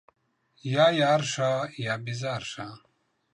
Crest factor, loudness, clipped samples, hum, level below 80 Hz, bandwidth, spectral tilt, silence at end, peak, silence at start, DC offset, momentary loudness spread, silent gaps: 18 dB; -26 LUFS; under 0.1%; none; -70 dBFS; 11 kHz; -4.5 dB/octave; 0.55 s; -10 dBFS; 0.65 s; under 0.1%; 17 LU; none